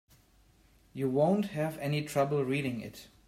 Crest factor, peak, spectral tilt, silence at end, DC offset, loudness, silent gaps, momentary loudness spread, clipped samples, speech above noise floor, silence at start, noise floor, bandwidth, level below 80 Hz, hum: 18 dB; -14 dBFS; -6.5 dB/octave; 0.2 s; under 0.1%; -31 LUFS; none; 12 LU; under 0.1%; 33 dB; 0.95 s; -64 dBFS; 16 kHz; -66 dBFS; none